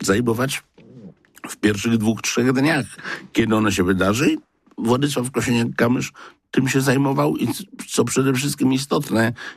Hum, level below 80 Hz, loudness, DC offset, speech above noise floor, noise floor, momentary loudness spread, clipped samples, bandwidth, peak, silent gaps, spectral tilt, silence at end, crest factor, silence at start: none; -54 dBFS; -20 LUFS; under 0.1%; 24 dB; -44 dBFS; 8 LU; under 0.1%; 15.5 kHz; -6 dBFS; none; -5 dB/octave; 0 s; 14 dB; 0 s